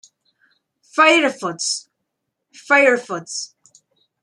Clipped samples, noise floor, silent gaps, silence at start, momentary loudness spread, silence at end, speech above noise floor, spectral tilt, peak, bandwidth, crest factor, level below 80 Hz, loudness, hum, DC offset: under 0.1%; -77 dBFS; none; 0.95 s; 15 LU; 0.75 s; 60 dB; -2 dB/octave; -2 dBFS; 12 kHz; 18 dB; -78 dBFS; -17 LUFS; none; under 0.1%